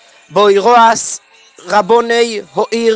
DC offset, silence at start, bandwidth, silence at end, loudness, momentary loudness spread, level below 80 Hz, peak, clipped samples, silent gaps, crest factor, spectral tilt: under 0.1%; 0.3 s; 9.8 kHz; 0 s; -11 LUFS; 11 LU; -58 dBFS; 0 dBFS; under 0.1%; none; 12 dB; -3 dB/octave